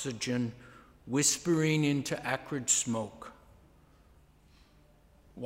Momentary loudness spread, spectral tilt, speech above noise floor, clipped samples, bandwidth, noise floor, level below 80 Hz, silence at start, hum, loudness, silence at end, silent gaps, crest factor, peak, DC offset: 12 LU; -3.5 dB/octave; 31 dB; under 0.1%; 16 kHz; -62 dBFS; -64 dBFS; 0 s; none; -30 LUFS; 0 s; none; 20 dB; -14 dBFS; under 0.1%